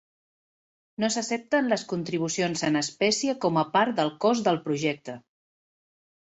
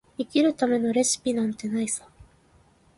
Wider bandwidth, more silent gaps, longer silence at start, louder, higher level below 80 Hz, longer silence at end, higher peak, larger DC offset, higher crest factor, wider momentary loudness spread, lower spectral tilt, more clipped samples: second, 8.4 kHz vs 11.5 kHz; neither; first, 1 s vs 0.2 s; about the same, -26 LUFS vs -25 LUFS; second, -70 dBFS vs -62 dBFS; first, 1.15 s vs 0.75 s; about the same, -10 dBFS vs -10 dBFS; neither; about the same, 18 dB vs 18 dB; about the same, 7 LU vs 6 LU; about the same, -4 dB/octave vs -3.5 dB/octave; neither